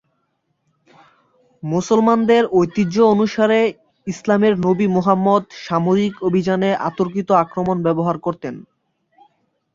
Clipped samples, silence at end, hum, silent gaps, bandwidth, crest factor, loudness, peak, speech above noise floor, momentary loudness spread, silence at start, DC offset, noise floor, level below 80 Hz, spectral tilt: under 0.1%; 1.15 s; none; none; 7.6 kHz; 16 dB; -17 LUFS; -2 dBFS; 53 dB; 10 LU; 1.65 s; under 0.1%; -69 dBFS; -56 dBFS; -7 dB/octave